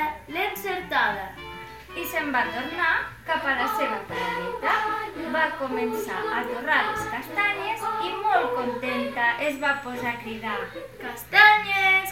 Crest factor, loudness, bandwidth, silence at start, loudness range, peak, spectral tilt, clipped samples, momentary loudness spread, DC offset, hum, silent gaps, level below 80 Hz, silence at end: 22 dB; -24 LUFS; 16.5 kHz; 0 s; 4 LU; -4 dBFS; -3.5 dB/octave; under 0.1%; 12 LU; 0.1%; none; none; -56 dBFS; 0 s